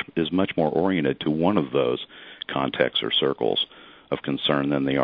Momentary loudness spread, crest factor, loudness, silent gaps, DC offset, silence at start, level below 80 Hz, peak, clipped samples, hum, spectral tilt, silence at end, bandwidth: 9 LU; 20 dB; -24 LUFS; none; under 0.1%; 0 s; -58 dBFS; -4 dBFS; under 0.1%; none; -9 dB/octave; 0 s; 5.2 kHz